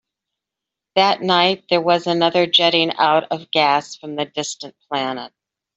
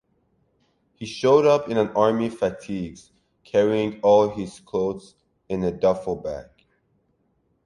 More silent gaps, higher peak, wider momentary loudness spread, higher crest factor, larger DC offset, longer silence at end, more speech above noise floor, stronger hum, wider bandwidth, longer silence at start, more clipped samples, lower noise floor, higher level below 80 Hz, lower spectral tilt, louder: neither; about the same, -2 dBFS vs -4 dBFS; second, 13 LU vs 16 LU; about the same, 18 dB vs 20 dB; neither; second, 0.5 s vs 1.25 s; first, 66 dB vs 47 dB; neither; second, 8.2 kHz vs 11 kHz; about the same, 0.95 s vs 1 s; neither; first, -85 dBFS vs -68 dBFS; second, -66 dBFS vs -54 dBFS; second, -3.5 dB/octave vs -6.5 dB/octave; first, -18 LUFS vs -22 LUFS